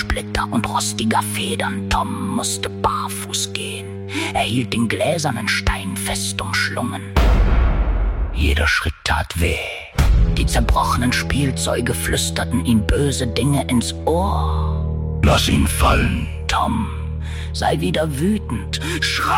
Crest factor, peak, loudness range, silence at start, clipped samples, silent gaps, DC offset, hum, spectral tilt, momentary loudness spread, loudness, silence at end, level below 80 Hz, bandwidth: 16 dB; -4 dBFS; 3 LU; 0 s; under 0.1%; none; under 0.1%; none; -4.5 dB/octave; 6 LU; -19 LUFS; 0 s; -24 dBFS; 16.5 kHz